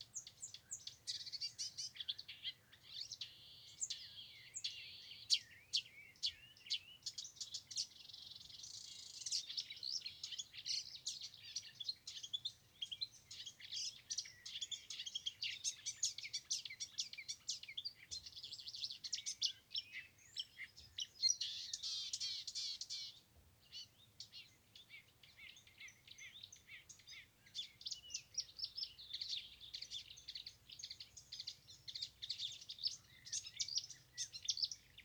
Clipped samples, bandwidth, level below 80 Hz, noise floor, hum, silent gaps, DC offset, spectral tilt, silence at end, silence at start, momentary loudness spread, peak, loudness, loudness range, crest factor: under 0.1%; over 20 kHz; -80 dBFS; -69 dBFS; none; none; under 0.1%; 2.5 dB/octave; 0 s; 0 s; 14 LU; -20 dBFS; -45 LUFS; 8 LU; 28 dB